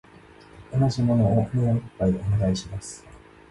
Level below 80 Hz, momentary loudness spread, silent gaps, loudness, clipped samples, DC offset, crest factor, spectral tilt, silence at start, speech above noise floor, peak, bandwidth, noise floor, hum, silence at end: -42 dBFS; 15 LU; none; -24 LUFS; under 0.1%; under 0.1%; 14 dB; -7.5 dB/octave; 0.55 s; 27 dB; -10 dBFS; 11.5 kHz; -49 dBFS; none; 0.35 s